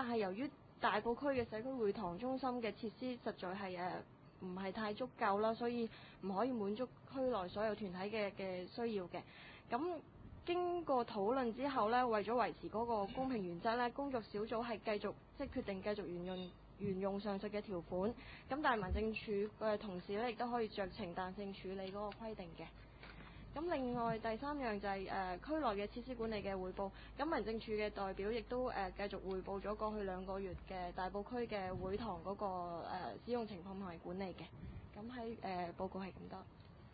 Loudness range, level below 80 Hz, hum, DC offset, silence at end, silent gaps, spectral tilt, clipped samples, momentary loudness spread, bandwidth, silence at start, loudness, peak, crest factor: 6 LU; -60 dBFS; none; under 0.1%; 0 s; none; -4.5 dB/octave; under 0.1%; 11 LU; 4.8 kHz; 0 s; -42 LUFS; -22 dBFS; 20 dB